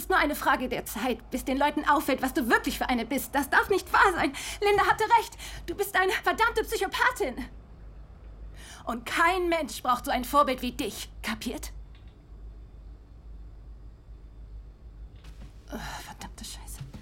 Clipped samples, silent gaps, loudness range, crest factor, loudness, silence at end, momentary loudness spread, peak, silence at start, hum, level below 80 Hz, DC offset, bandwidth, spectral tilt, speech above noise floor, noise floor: under 0.1%; none; 18 LU; 20 dB; -26 LUFS; 0 s; 24 LU; -8 dBFS; 0 s; none; -46 dBFS; under 0.1%; 16.5 kHz; -3.5 dB/octave; 21 dB; -48 dBFS